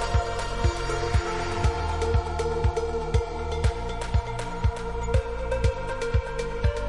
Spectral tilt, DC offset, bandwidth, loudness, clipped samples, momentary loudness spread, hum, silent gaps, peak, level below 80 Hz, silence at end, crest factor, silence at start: -6 dB/octave; 0.6%; 11.5 kHz; -28 LUFS; under 0.1%; 4 LU; none; none; -10 dBFS; -30 dBFS; 0 s; 16 dB; 0 s